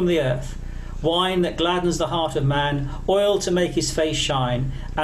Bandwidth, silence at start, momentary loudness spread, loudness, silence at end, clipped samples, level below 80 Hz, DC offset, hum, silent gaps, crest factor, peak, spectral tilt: 14 kHz; 0 s; 7 LU; -22 LUFS; 0 s; under 0.1%; -34 dBFS; under 0.1%; 60 Hz at -40 dBFS; none; 12 dB; -10 dBFS; -5 dB/octave